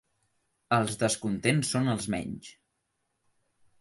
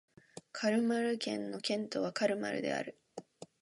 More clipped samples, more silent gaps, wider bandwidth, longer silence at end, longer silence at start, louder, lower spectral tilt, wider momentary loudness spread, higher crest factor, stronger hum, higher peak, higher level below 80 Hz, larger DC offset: neither; neither; about the same, 12 kHz vs 11.5 kHz; first, 1.3 s vs 0.15 s; first, 0.7 s vs 0.35 s; first, -28 LUFS vs -35 LUFS; about the same, -4.5 dB/octave vs -4.5 dB/octave; second, 9 LU vs 20 LU; about the same, 22 dB vs 18 dB; neither; first, -10 dBFS vs -18 dBFS; first, -60 dBFS vs -82 dBFS; neither